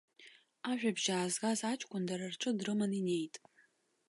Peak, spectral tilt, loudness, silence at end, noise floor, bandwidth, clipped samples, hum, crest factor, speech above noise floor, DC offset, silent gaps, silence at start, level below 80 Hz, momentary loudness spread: -18 dBFS; -4 dB/octave; -36 LUFS; 0.7 s; -72 dBFS; 11.5 kHz; under 0.1%; none; 20 dB; 36 dB; under 0.1%; none; 0.2 s; -84 dBFS; 6 LU